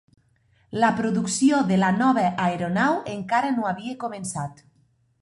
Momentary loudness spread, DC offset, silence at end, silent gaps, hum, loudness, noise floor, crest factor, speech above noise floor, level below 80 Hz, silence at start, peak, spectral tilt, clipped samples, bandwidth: 11 LU; under 0.1%; 0.7 s; none; none; -23 LUFS; -64 dBFS; 18 dB; 41 dB; -60 dBFS; 0.7 s; -6 dBFS; -5 dB/octave; under 0.1%; 11.5 kHz